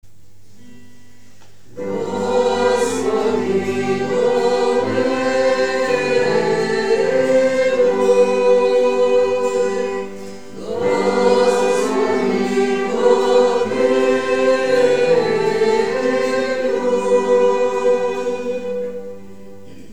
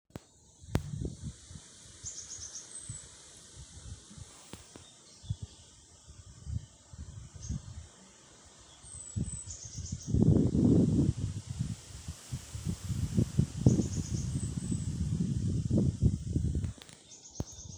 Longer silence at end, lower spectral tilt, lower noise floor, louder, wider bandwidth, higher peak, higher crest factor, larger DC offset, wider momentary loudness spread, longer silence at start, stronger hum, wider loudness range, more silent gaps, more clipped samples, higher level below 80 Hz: about the same, 0 s vs 0 s; second, -4.5 dB/octave vs -6.5 dB/octave; second, -51 dBFS vs -58 dBFS; first, -17 LUFS vs -33 LUFS; second, 11.5 kHz vs 20 kHz; first, -2 dBFS vs -6 dBFS; second, 16 dB vs 28 dB; first, 2% vs under 0.1%; second, 9 LU vs 24 LU; first, 1.75 s vs 0.15 s; neither; second, 3 LU vs 16 LU; neither; neither; second, -58 dBFS vs -44 dBFS